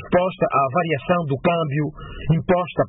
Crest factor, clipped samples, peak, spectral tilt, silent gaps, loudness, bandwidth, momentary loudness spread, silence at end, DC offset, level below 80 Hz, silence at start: 14 dB; under 0.1%; -6 dBFS; -12 dB/octave; none; -21 LUFS; 4 kHz; 6 LU; 0 s; under 0.1%; -44 dBFS; 0 s